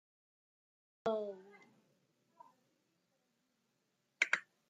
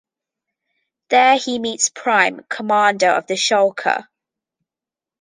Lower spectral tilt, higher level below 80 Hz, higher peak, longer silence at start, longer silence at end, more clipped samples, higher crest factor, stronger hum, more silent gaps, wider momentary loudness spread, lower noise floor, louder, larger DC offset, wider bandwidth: about the same, -2.5 dB/octave vs -1.5 dB/octave; second, under -90 dBFS vs -70 dBFS; second, -16 dBFS vs -2 dBFS; about the same, 1.05 s vs 1.1 s; second, 0.3 s vs 1.2 s; neither; first, 30 dB vs 18 dB; neither; neither; first, 13 LU vs 7 LU; second, -82 dBFS vs -89 dBFS; second, -38 LUFS vs -17 LUFS; neither; about the same, 9.6 kHz vs 10 kHz